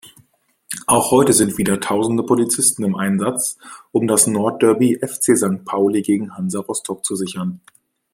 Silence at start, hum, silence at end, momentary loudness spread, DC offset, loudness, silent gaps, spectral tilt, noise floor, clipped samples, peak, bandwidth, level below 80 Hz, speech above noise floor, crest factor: 0.05 s; none; 0.55 s; 10 LU; under 0.1%; -17 LUFS; none; -4.5 dB/octave; -57 dBFS; under 0.1%; 0 dBFS; 16.5 kHz; -56 dBFS; 39 dB; 18 dB